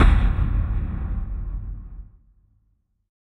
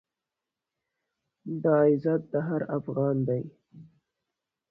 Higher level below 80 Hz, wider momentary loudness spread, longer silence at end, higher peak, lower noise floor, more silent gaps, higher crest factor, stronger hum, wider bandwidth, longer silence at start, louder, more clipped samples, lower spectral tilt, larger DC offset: first, -24 dBFS vs -68 dBFS; first, 19 LU vs 14 LU; first, 1.15 s vs 0.9 s; first, -2 dBFS vs -12 dBFS; second, -67 dBFS vs -88 dBFS; neither; about the same, 20 dB vs 18 dB; neither; second, 4.3 kHz vs 5 kHz; second, 0 s vs 1.45 s; about the same, -26 LUFS vs -27 LUFS; neither; second, -8 dB/octave vs -12.5 dB/octave; neither